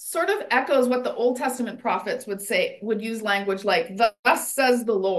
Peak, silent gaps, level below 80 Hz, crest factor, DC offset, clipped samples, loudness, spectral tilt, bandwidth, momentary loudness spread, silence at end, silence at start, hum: -6 dBFS; 4.19-4.23 s; -74 dBFS; 18 dB; under 0.1%; under 0.1%; -23 LUFS; -3 dB/octave; 13 kHz; 6 LU; 0 s; 0 s; none